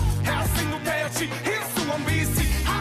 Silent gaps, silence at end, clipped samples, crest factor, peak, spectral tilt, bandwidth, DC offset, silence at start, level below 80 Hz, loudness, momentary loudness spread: none; 0 s; under 0.1%; 12 dB; -12 dBFS; -4.5 dB/octave; 15.5 kHz; under 0.1%; 0 s; -30 dBFS; -25 LUFS; 3 LU